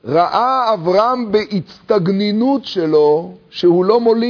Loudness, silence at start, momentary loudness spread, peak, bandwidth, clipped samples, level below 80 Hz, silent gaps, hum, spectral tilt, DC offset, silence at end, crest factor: -15 LUFS; 0.05 s; 6 LU; -2 dBFS; 5.4 kHz; under 0.1%; -58 dBFS; none; none; -7.5 dB/octave; under 0.1%; 0 s; 14 dB